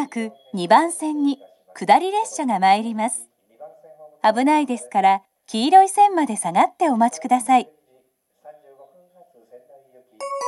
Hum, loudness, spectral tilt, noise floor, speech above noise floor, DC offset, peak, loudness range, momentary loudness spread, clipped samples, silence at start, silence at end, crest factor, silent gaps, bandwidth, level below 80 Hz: none; -19 LUFS; -3.5 dB/octave; -63 dBFS; 45 dB; under 0.1%; 0 dBFS; 5 LU; 14 LU; under 0.1%; 0 s; 0 s; 20 dB; none; 12.5 kHz; -78 dBFS